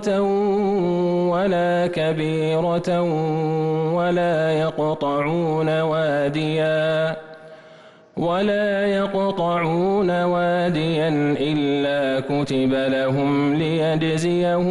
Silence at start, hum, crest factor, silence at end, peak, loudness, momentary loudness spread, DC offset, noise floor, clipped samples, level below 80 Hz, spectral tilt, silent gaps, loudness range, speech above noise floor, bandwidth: 0 s; none; 8 dB; 0 s; -12 dBFS; -21 LUFS; 2 LU; under 0.1%; -47 dBFS; under 0.1%; -54 dBFS; -7 dB/octave; none; 2 LU; 27 dB; 11.5 kHz